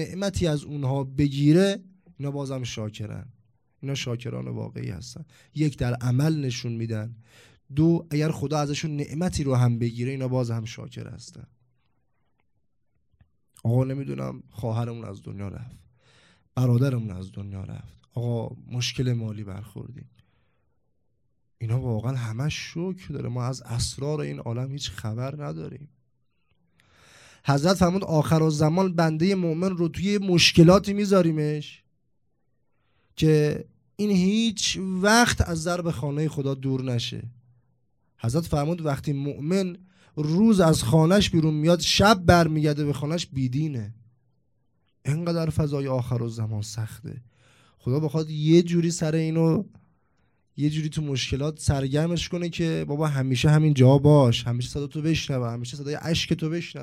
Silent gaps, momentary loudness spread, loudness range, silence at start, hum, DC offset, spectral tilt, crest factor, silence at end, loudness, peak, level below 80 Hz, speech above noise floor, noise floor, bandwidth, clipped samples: none; 18 LU; 11 LU; 0 s; none; under 0.1%; -6 dB/octave; 22 dB; 0 s; -24 LUFS; -4 dBFS; -48 dBFS; 51 dB; -75 dBFS; 14.5 kHz; under 0.1%